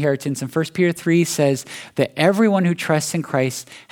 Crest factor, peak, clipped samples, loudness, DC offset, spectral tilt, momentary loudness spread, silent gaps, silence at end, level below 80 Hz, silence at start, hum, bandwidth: 18 dB; 0 dBFS; under 0.1%; -19 LUFS; under 0.1%; -5.5 dB/octave; 7 LU; none; 0.1 s; -66 dBFS; 0 s; none; 18 kHz